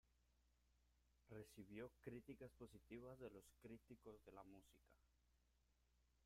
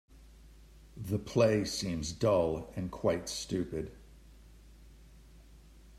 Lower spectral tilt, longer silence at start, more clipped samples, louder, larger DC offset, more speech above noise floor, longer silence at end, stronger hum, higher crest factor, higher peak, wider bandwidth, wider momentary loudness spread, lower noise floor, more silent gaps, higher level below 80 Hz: about the same, -6.5 dB/octave vs -5.5 dB/octave; about the same, 0.05 s vs 0.15 s; neither; second, -62 LUFS vs -32 LUFS; neither; about the same, 22 dB vs 24 dB; about the same, 0 s vs 0 s; first, 60 Hz at -75 dBFS vs none; about the same, 20 dB vs 22 dB; second, -42 dBFS vs -14 dBFS; about the same, 15.5 kHz vs 14.5 kHz; second, 7 LU vs 13 LU; first, -83 dBFS vs -56 dBFS; neither; second, -78 dBFS vs -54 dBFS